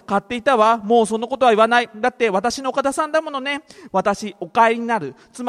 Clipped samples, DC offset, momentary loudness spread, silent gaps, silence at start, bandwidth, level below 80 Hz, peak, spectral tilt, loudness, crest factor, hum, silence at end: under 0.1%; under 0.1%; 9 LU; none; 0.1 s; 13.5 kHz; -58 dBFS; -2 dBFS; -4 dB/octave; -19 LUFS; 18 dB; none; 0 s